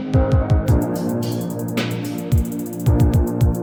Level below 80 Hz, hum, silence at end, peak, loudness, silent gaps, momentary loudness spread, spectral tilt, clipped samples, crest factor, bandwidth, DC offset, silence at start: -26 dBFS; none; 0 s; -4 dBFS; -20 LUFS; none; 7 LU; -7.5 dB/octave; under 0.1%; 14 dB; over 20 kHz; under 0.1%; 0 s